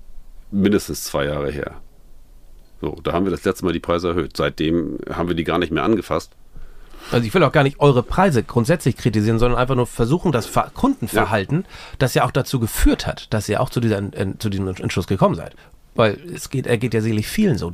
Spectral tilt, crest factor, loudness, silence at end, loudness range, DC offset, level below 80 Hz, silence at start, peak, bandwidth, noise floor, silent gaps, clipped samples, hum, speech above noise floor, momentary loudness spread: -6 dB/octave; 18 dB; -20 LUFS; 0 s; 6 LU; under 0.1%; -34 dBFS; 0.1 s; -2 dBFS; 15.5 kHz; -42 dBFS; none; under 0.1%; none; 23 dB; 9 LU